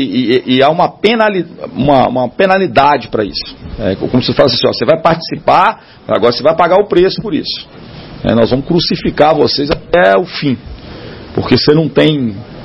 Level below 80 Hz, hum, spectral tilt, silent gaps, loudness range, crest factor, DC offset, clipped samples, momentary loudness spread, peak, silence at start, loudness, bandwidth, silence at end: -36 dBFS; none; -7.5 dB/octave; none; 2 LU; 12 dB; 0.2%; 0.3%; 12 LU; 0 dBFS; 0 s; -11 LUFS; 9.6 kHz; 0 s